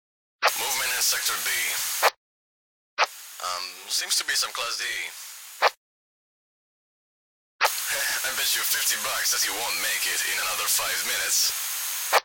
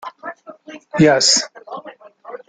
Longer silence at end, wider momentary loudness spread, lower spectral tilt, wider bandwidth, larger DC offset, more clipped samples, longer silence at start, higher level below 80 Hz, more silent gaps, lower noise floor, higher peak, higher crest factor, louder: second, 0 s vs 0.15 s; second, 8 LU vs 23 LU; second, 2.5 dB/octave vs -3 dB/octave; first, 17 kHz vs 10 kHz; neither; neither; first, 0.4 s vs 0.05 s; second, -66 dBFS vs -58 dBFS; first, 2.17-2.97 s, 5.77-7.59 s vs none; first, under -90 dBFS vs -39 dBFS; second, -6 dBFS vs -2 dBFS; about the same, 22 dB vs 18 dB; second, -24 LUFS vs -14 LUFS